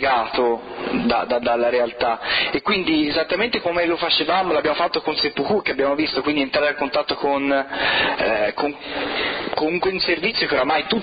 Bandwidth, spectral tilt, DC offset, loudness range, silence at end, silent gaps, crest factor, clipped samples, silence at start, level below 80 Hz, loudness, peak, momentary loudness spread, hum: 5.2 kHz; -8 dB/octave; under 0.1%; 1 LU; 0 s; none; 14 dB; under 0.1%; 0 s; -50 dBFS; -20 LUFS; -6 dBFS; 4 LU; none